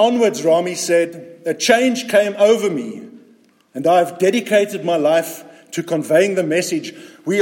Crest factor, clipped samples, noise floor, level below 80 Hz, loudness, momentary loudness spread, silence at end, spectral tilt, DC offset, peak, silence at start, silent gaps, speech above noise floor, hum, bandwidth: 16 dB; under 0.1%; -52 dBFS; -70 dBFS; -17 LUFS; 14 LU; 0 s; -4 dB/octave; under 0.1%; 0 dBFS; 0 s; none; 36 dB; none; 17 kHz